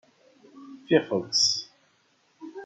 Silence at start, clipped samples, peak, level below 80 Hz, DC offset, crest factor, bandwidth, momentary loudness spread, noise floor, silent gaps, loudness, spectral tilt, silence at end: 0.55 s; under 0.1%; -6 dBFS; -76 dBFS; under 0.1%; 24 dB; 11 kHz; 25 LU; -66 dBFS; none; -24 LUFS; -2.5 dB/octave; 0 s